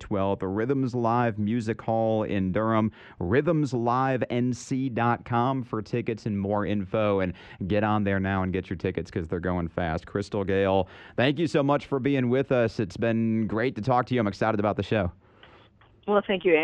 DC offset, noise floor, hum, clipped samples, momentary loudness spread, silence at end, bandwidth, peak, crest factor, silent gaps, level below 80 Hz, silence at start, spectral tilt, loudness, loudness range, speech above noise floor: under 0.1%; -56 dBFS; none; under 0.1%; 6 LU; 0 s; 9.4 kHz; -8 dBFS; 18 dB; none; -52 dBFS; 0 s; -7.5 dB/octave; -26 LUFS; 2 LU; 31 dB